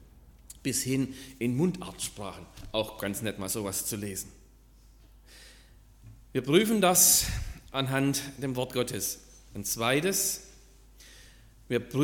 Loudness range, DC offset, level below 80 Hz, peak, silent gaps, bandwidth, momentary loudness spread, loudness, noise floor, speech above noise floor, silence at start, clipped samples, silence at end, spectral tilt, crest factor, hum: 10 LU; under 0.1%; -50 dBFS; -8 dBFS; none; 17.5 kHz; 15 LU; -28 LUFS; -56 dBFS; 27 dB; 0 s; under 0.1%; 0 s; -3.5 dB/octave; 24 dB; none